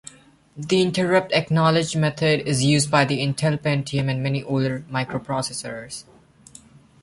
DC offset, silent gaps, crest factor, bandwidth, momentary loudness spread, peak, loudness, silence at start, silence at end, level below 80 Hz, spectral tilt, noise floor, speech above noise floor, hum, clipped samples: under 0.1%; none; 18 dB; 11.5 kHz; 11 LU; -4 dBFS; -21 LUFS; 0.55 s; 1 s; -56 dBFS; -5 dB/octave; -49 dBFS; 27 dB; none; under 0.1%